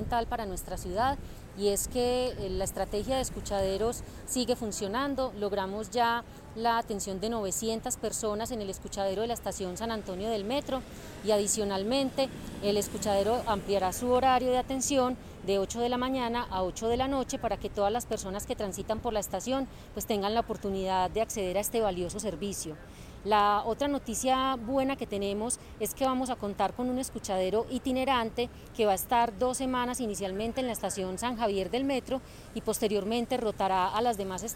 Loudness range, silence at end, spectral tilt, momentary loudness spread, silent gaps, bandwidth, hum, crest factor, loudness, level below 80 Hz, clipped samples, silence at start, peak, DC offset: 4 LU; 0 s; -4 dB/octave; 7 LU; none; 17 kHz; none; 16 dB; -31 LUFS; -48 dBFS; under 0.1%; 0 s; -14 dBFS; under 0.1%